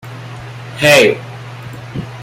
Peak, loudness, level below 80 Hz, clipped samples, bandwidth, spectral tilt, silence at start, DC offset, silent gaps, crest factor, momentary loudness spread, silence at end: 0 dBFS; -10 LUFS; -48 dBFS; under 0.1%; 16.5 kHz; -4 dB/octave; 0.05 s; under 0.1%; none; 16 dB; 22 LU; 0 s